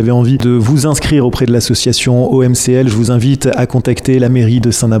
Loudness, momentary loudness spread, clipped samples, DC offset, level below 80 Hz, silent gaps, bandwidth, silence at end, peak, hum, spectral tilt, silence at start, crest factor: -11 LUFS; 2 LU; under 0.1%; under 0.1%; -32 dBFS; none; 13.5 kHz; 0 s; -2 dBFS; none; -5.5 dB/octave; 0 s; 8 dB